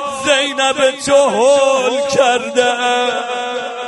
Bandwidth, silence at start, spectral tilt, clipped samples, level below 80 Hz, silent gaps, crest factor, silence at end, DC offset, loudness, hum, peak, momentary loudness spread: 11.5 kHz; 0 s; -2 dB/octave; under 0.1%; -56 dBFS; none; 14 dB; 0 s; under 0.1%; -14 LUFS; none; 0 dBFS; 7 LU